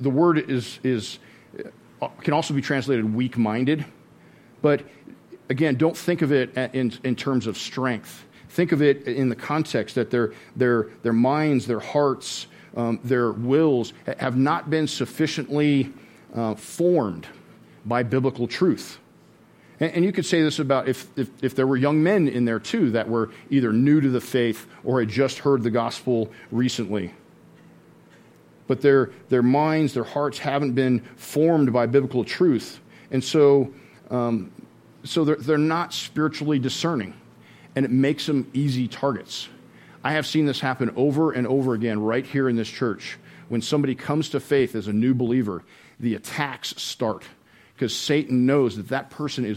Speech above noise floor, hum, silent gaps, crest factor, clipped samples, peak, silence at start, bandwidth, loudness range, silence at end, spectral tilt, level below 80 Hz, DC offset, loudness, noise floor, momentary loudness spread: 31 dB; none; none; 18 dB; under 0.1%; -4 dBFS; 0 s; 16.5 kHz; 4 LU; 0 s; -6 dB/octave; -66 dBFS; under 0.1%; -23 LUFS; -53 dBFS; 10 LU